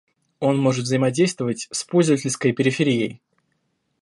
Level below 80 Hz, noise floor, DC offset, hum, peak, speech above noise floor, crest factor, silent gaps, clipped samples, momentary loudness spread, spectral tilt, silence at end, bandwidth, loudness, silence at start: -66 dBFS; -71 dBFS; under 0.1%; none; -6 dBFS; 51 dB; 16 dB; none; under 0.1%; 6 LU; -5.5 dB/octave; 0.85 s; 11.5 kHz; -21 LUFS; 0.4 s